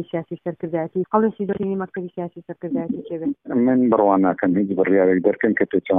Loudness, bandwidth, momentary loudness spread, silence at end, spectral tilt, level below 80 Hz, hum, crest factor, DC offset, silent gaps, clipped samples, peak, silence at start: -21 LUFS; 3.8 kHz; 13 LU; 0 s; -12 dB/octave; -60 dBFS; none; 18 dB; under 0.1%; none; under 0.1%; -2 dBFS; 0 s